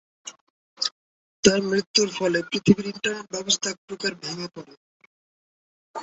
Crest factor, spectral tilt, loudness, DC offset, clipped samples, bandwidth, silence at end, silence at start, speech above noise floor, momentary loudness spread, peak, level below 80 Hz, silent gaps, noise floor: 24 dB; -3.5 dB/octave; -24 LUFS; under 0.1%; under 0.1%; 8.2 kHz; 0 s; 0.25 s; over 66 dB; 19 LU; -2 dBFS; -58 dBFS; 0.41-0.77 s, 0.92-1.43 s, 1.87-1.94 s, 3.78-3.88 s, 4.77-5.00 s, 5.06-5.94 s; under -90 dBFS